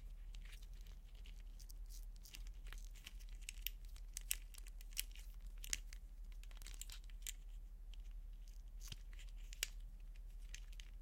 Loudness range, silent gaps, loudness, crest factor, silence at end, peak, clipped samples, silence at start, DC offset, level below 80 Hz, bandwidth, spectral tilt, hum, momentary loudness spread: 6 LU; none; -53 LUFS; 36 dB; 0 s; -16 dBFS; under 0.1%; 0 s; under 0.1%; -52 dBFS; 16.5 kHz; -1 dB/octave; none; 12 LU